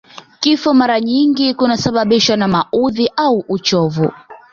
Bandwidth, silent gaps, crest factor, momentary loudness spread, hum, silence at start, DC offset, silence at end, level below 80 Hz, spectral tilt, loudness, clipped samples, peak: 7.4 kHz; none; 14 dB; 4 LU; none; 0.15 s; under 0.1%; 0.15 s; -50 dBFS; -5 dB/octave; -14 LUFS; under 0.1%; 0 dBFS